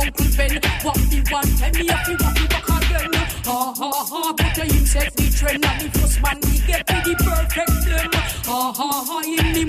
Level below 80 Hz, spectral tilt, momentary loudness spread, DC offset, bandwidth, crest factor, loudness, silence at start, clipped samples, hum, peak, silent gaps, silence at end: -22 dBFS; -4 dB/octave; 4 LU; under 0.1%; 16 kHz; 14 dB; -19 LUFS; 0 s; under 0.1%; none; -4 dBFS; none; 0 s